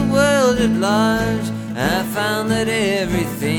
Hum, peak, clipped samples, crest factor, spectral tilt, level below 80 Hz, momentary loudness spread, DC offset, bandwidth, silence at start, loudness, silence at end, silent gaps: none; -2 dBFS; under 0.1%; 16 dB; -5 dB/octave; -38 dBFS; 6 LU; under 0.1%; 19.5 kHz; 0 s; -18 LUFS; 0 s; none